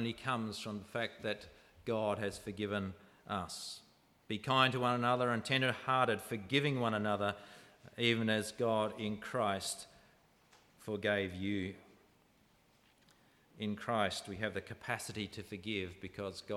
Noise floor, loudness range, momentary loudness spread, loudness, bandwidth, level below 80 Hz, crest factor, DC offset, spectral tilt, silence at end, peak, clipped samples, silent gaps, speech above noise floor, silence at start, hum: -70 dBFS; 8 LU; 13 LU; -36 LUFS; 15.5 kHz; -70 dBFS; 24 dB; under 0.1%; -4.5 dB/octave; 0 s; -14 dBFS; under 0.1%; none; 33 dB; 0 s; none